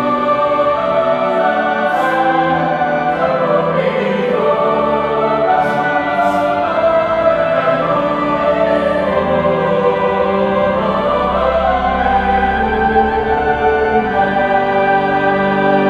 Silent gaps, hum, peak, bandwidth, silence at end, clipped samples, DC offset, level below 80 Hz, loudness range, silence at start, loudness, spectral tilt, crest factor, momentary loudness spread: none; none; 0 dBFS; 9.8 kHz; 0 s; under 0.1%; under 0.1%; -36 dBFS; 1 LU; 0 s; -14 LUFS; -7 dB/octave; 14 dB; 2 LU